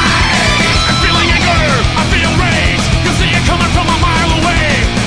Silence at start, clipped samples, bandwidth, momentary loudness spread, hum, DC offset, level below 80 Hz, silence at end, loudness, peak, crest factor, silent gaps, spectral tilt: 0 s; under 0.1%; 10.5 kHz; 2 LU; none; under 0.1%; -18 dBFS; 0 s; -10 LUFS; 0 dBFS; 10 dB; none; -4 dB/octave